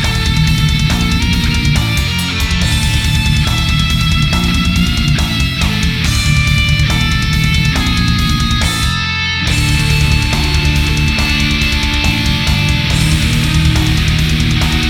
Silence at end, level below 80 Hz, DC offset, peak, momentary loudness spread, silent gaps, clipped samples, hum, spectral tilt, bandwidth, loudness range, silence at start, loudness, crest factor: 0 s; -18 dBFS; under 0.1%; 0 dBFS; 2 LU; none; under 0.1%; none; -4 dB/octave; 17.5 kHz; 1 LU; 0 s; -13 LUFS; 12 dB